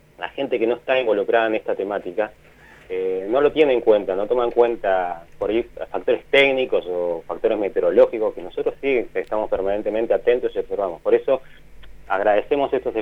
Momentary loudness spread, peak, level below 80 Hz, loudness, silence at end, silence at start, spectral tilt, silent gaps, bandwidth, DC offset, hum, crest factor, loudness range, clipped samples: 10 LU; -2 dBFS; -48 dBFS; -21 LUFS; 0 s; 0.2 s; -6 dB/octave; none; 6 kHz; under 0.1%; none; 18 dB; 2 LU; under 0.1%